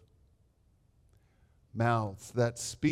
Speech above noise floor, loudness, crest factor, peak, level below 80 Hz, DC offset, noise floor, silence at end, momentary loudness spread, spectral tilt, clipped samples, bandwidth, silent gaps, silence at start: 37 dB; -32 LUFS; 18 dB; -16 dBFS; -64 dBFS; under 0.1%; -68 dBFS; 0 s; 6 LU; -5.5 dB/octave; under 0.1%; 14.5 kHz; none; 1.75 s